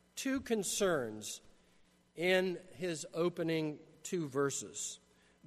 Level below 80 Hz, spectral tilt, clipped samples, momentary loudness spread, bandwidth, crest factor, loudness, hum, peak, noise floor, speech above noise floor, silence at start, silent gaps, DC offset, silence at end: -70 dBFS; -4 dB/octave; under 0.1%; 12 LU; 13.5 kHz; 18 dB; -36 LUFS; none; -18 dBFS; -68 dBFS; 32 dB; 0.15 s; none; under 0.1%; 0.5 s